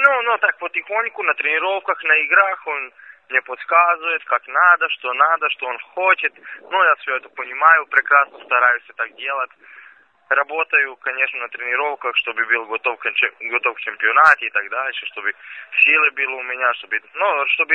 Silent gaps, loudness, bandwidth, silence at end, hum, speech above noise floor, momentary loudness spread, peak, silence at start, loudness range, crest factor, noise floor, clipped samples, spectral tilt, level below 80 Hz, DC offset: none; -17 LUFS; 8.8 kHz; 0 s; none; 29 dB; 11 LU; 0 dBFS; 0 s; 3 LU; 18 dB; -48 dBFS; under 0.1%; -1.5 dB/octave; -80 dBFS; under 0.1%